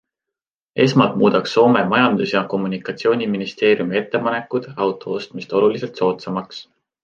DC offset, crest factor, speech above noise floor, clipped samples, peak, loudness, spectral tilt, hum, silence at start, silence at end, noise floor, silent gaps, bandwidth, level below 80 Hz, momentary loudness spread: under 0.1%; 18 dB; 68 dB; under 0.1%; -2 dBFS; -18 LUFS; -6.5 dB/octave; none; 0.75 s; 0.4 s; -86 dBFS; none; 7.4 kHz; -62 dBFS; 12 LU